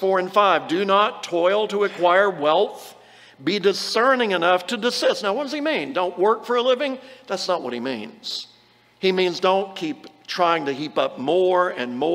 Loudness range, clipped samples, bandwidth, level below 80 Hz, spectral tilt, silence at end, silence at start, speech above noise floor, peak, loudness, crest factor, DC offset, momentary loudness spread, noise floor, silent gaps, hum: 4 LU; under 0.1%; 16 kHz; -76 dBFS; -4 dB/octave; 0 s; 0 s; 34 dB; -2 dBFS; -21 LUFS; 18 dB; under 0.1%; 12 LU; -55 dBFS; none; none